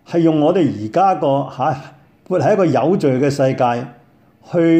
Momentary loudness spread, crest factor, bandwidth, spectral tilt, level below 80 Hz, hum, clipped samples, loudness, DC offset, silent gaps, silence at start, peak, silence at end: 8 LU; 12 dB; 9 kHz; -7.5 dB/octave; -60 dBFS; none; under 0.1%; -16 LUFS; under 0.1%; none; 0.1 s; -4 dBFS; 0 s